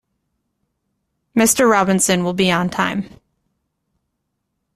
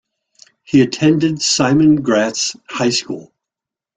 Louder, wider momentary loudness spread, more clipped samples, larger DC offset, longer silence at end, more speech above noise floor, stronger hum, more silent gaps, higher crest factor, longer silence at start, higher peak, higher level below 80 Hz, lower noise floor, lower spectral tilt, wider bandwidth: about the same, -16 LUFS vs -15 LUFS; about the same, 9 LU vs 8 LU; neither; neither; first, 1.7 s vs 0.75 s; second, 58 dB vs 72 dB; neither; neither; about the same, 18 dB vs 16 dB; first, 1.35 s vs 0.7 s; about the same, -2 dBFS vs -2 dBFS; about the same, -54 dBFS vs -52 dBFS; second, -74 dBFS vs -87 dBFS; about the same, -4 dB/octave vs -4.5 dB/octave; first, 15.5 kHz vs 9.4 kHz